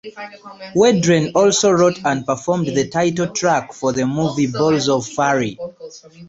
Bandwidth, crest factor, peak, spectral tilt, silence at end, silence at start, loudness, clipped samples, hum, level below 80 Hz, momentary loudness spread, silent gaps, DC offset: 8 kHz; 16 dB; 0 dBFS; -4.5 dB/octave; 0 s; 0.05 s; -17 LUFS; under 0.1%; none; -54 dBFS; 19 LU; none; under 0.1%